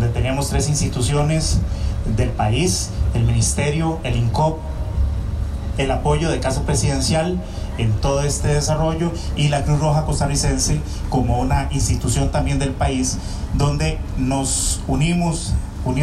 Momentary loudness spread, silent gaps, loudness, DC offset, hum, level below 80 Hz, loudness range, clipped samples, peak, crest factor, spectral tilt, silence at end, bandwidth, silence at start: 5 LU; none; -20 LUFS; under 0.1%; none; -24 dBFS; 1 LU; under 0.1%; -8 dBFS; 12 dB; -5 dB/octave; 0 s; 13.5 kHz; 0 s